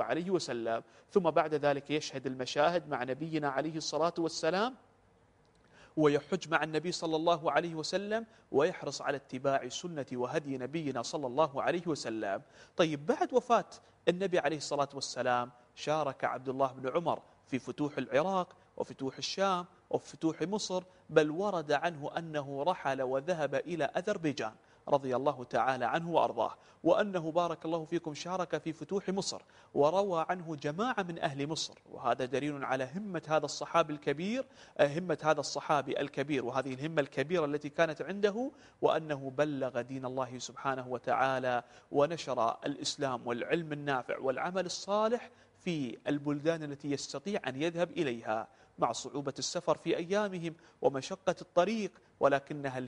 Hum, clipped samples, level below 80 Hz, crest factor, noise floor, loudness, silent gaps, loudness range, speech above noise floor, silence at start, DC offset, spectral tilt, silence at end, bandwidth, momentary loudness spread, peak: none; under 0.1%; -72 dBFS; 24 dB; -66 dBFS; -34 LUFS; none; 2 LU; 33 dB; 0 s; under 0.1%; -5 dB/octave; 0 s; 10.5 kHz; 8 LU; -10 dBFS